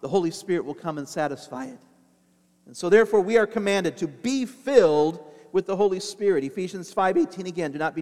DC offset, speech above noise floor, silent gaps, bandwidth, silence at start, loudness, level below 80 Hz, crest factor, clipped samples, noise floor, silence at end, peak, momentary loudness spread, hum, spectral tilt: under 0.1%; 39 dB; none; 13.5 kHz; 0.05 s; -24 LUFS; -64 dBFS; 20 dB; under 0.1%; -63 dBFS; 0 s; -4 dBFS; 13 LU; none; -5 dB/octave